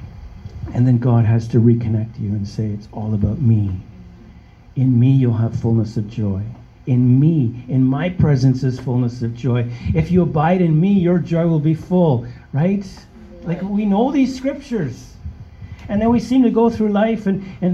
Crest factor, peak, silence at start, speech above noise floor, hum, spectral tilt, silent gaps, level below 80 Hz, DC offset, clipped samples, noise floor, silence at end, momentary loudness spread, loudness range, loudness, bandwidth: 14 dB; -2 dBFS; 0 s; 26 dB; none; -9.5 dB/octave; none; -40 dBFS; under 0.1%; under 0.1%; -42 dBFS; 0 s; 14 LU; 4 LU; -18 LUFS; 7.4 kHz